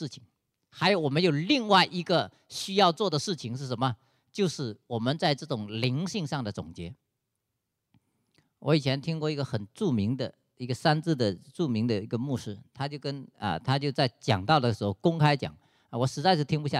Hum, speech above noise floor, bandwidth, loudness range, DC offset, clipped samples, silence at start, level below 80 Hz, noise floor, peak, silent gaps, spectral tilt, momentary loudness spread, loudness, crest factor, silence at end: none; 55 dB; 13 kHz; 7 LU; under 0.1%; under 0.1%; 0 s; -66 dBFS; -83 dBFS; -8 dBFS; none; -5.5 dB/octave; 13 LU; -28 LUFS; 22 dB; 0 s